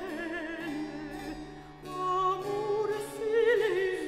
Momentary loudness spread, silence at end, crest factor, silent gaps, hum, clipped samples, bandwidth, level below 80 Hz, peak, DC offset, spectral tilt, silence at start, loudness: 15 LU; 0 s; 16 dB; none; none; under 0.1%; 15.5 kHz; -58 dBFS; -14 dBFS; under 0.1%; -5 dB/octave; 0 s; -31 LUFS